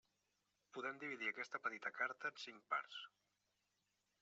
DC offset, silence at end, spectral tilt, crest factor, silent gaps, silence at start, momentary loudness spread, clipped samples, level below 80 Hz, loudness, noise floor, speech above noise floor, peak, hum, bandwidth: under 0.1%; 1.15 s; 0.5 dB/octave; 22 dB; none; 0.75 s; 11 LU; under 0.1%; under -90 dBFS; -46 LUFS; -87 dBFS; 40 dB; -26 dBFS; none; 7.6 kHz